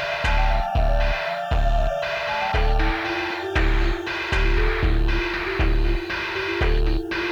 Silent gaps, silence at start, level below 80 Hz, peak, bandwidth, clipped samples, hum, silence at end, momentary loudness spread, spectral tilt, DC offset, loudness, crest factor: none; 0 s; -22 dBFS; -10 dBFS; 7.6 kHz; under 0.1%; none; 0 s; 3 LU; -6 dB/octave; under 0.1%; -23 LUFS; 12 dB